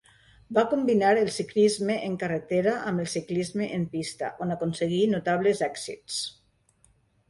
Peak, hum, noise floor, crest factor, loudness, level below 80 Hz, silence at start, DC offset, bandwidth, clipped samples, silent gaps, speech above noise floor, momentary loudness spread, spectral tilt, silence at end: -10 dBFS; none; -64 dBFS; 16 dB; -27 LUFS; -64 dBFS; 0.5 s; under 0.1%; 11.5 kHz; under 0.1%; none; 39 dB; 9 LU; -5 dB/octave; 1 s